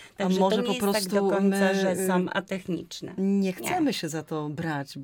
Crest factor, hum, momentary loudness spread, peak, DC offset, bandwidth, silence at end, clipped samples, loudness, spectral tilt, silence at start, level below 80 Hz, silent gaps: 16 dB; none; 9 LU; -10 dBFS; under 0.1%; 19 kHz; 0 s; under 0.1%; -26 LUFS; -5.5 dB/octave; 0 s; -64 dBFS; none